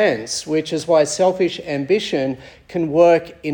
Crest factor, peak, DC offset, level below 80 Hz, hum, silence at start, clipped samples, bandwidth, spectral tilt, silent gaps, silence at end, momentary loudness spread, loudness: 16 dB; -2 dBFS; under 0.1%; -56 dBFS; none; 0 s; under 0.1%; 18 kHz; -4.5 dB/octave; none; 0 s; 11 LU; -18 LUFS